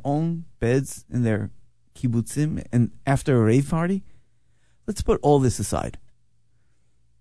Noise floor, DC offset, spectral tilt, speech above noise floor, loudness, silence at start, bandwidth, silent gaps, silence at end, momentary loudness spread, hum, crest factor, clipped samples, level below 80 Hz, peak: -67 dBFS; 0.7%; -7 dB/octave; 45 dB; -23 LUFS; 0.05 s; 11 kHz; none; 1.2 s; 10 LU; none; 20 dB; under 0.1%; -42 dBFS; -4 dBFS